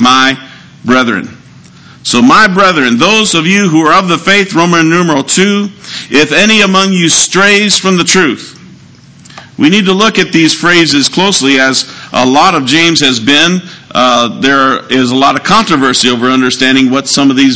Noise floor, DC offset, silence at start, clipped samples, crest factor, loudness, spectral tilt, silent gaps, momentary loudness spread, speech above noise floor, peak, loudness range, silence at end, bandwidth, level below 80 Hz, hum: -36 dBFS; 0.9%; 0 s; 3%; 8 dB; -7 LUFS; -3.5 dB/octave; none; 6 LU; 29 dB; 0 dBFS; 2 LU; 0 s; 8 kHz; -46 dBFS; none